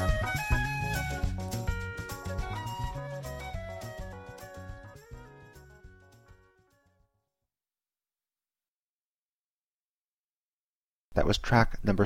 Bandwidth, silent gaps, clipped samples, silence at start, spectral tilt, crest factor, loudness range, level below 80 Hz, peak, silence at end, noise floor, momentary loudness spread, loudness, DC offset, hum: 16.5 kHz; 8.68-11.12 s; under 0.1%; 0 s; -5.5 dB/octave; 24 dB; 20 LU; -40 dBFS; -10 dBFS; 0 s; under -90 dBFS; 23 LU; -32 LUFS; under 0.1%; none